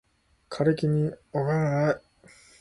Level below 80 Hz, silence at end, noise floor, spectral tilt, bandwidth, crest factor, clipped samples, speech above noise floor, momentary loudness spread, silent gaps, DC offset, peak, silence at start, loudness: -60 dBFS; 0.65 s; -56 dBFS; -8 dB/octave; 11 kHz; 18 dB; under 0.1%; 31 dB; 7 LU; none; under 0.1%; -10 dBFS; 0.5 s; -26 LUFS